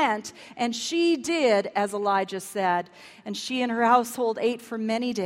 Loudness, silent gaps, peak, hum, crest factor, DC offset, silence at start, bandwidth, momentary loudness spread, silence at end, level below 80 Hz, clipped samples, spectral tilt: -25 LUFS; none; -6 dBFS; none; 18 dB; under 0.1%; 0 s; 16 kHz; 10 LU; 0 s; -72 dBFS; under 0.1%; -3.5 dB/octave